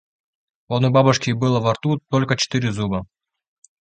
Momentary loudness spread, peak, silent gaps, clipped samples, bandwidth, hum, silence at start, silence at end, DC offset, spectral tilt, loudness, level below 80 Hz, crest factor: 9 LU; -2 dBFS; none; under 0.1%; 9 kHz; none; 0.7 s; 0.75 s; under 0.1%; -5.5 dB/octave; -20 LUFS; -50 dBFS; 20 dB